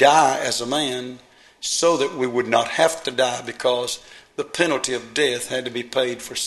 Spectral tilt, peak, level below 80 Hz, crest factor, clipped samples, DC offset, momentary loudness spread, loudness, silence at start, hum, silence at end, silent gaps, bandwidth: -2.5 dB/octave; -2 dBFS; -62 dBFS; 20 dB; under 0.1%; under 0.1%; 11 LU; -21 LUFS; 0 s; none; 0 s; none; 13 kHz